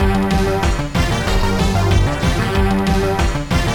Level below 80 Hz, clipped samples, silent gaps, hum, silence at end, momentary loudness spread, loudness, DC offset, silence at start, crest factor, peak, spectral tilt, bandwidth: -20 dBFS; under 0.1%; none; none; 0 s; 3 LU; -17 LUFS; 0.7%; 0 s; 12 dB; -4 dBFS; -5.5 dB/octave; 18.5 kHz